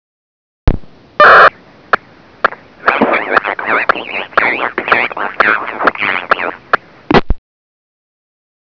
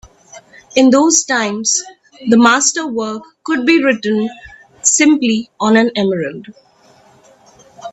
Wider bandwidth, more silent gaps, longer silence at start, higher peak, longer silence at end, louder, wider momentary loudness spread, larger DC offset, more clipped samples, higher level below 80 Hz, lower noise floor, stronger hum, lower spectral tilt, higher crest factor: second, 5.4 kHz vs 9.2 kHz; neither; first, 0.65 s vs 0.35 s; about the same, 0 dBFS vs 0 dBFS; first, 1.3 s vs 0 s; about the same, -12 LUFS vs -13 LUFS; about the same, 12 LU vs 14 LU; neither; first, 0.8% vs under 0.1%; first, -28 dBFS vs -56 dBFS; second, -32 dBFS vs -48 dBFS; neither; first, -6.5 dB/octave vs -2.5 dB/octave; about the same, 14 dB vs 16 dB